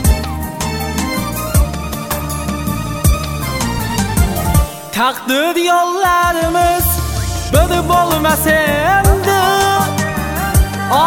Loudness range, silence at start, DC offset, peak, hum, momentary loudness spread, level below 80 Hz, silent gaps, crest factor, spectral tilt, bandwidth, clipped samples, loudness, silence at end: 5 LU; 0 s; under 0.1%; 0 dBFS; none; 8 LU; -22 dBFS; none; 14 dB; -4.5 dB/octave; 18 kHz; under 0.1%; -15 LUFS; 0 s